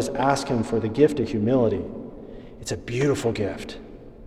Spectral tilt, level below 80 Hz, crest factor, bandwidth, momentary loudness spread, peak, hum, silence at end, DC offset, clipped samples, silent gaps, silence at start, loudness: -6 dB/octave; -46 dBFS; 20 dB; 13.5 kHz; 19 LU; -6 dBFS; none; 0 s; under 0.1%; under 0.1%; none; 0 s; -24 LUFS